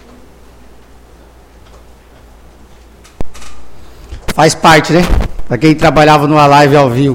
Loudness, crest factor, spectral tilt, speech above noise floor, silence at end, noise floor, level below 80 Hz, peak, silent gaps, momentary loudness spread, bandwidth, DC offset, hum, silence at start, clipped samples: -8 LUFS; 12 dB; -5.5 dB/octave; 32 dB; 0 s; -39 dBFS; -24 dBFS; 0 dBFS; none; 23 LU; 17 kHz; under 0.1%; none; 3.2 s; 0.9%